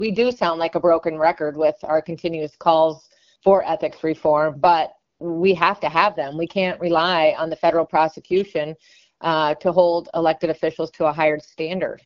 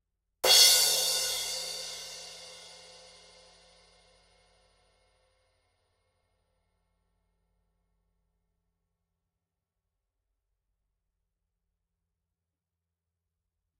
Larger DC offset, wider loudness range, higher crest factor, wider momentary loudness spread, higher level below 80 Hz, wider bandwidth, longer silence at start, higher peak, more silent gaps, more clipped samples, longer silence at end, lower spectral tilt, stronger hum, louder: neither; second, 2 LU vs 24 LU; second, 20 dB vs 28 dB; second, 9 LU vs 26 LU; first, -58 dBFS vs -70 dBFS; second, 7 kHz vs 16 kHz; second, 0 s vs 0.45 s; first, 0 dBFS vs -6 dBFS; neither; neither; second, 0.1 s vs 11.1 s; first, -3.5 dB/octave vs 2.5 dB/octave; neither; about the same, -20 LUFS vs -22 LUFS